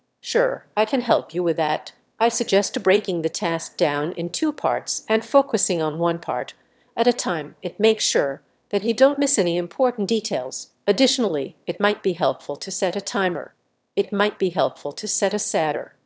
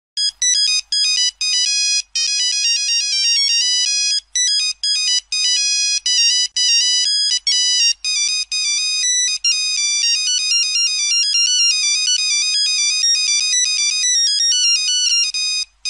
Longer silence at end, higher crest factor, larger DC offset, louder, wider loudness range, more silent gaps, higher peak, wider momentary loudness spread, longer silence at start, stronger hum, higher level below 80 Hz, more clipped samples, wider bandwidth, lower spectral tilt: first, 0.15 s vs 0 s; first, 20 dB vs 12 dB; neither; second, -22 LUFS vs -14 LUFS; about the same, 3 LU vs 1 LU; neither; about the same, -2 dBFS vs -4 dBFS; first, 9 LU vs 3 LU; about the same, 0.25 s vs 0.15 s; neither; second, -72 dBFS vs -60 dBFS; neither; second, 8 kHz vs 11 kHz; first, -3.5 dB/octave vs 8 dB/octave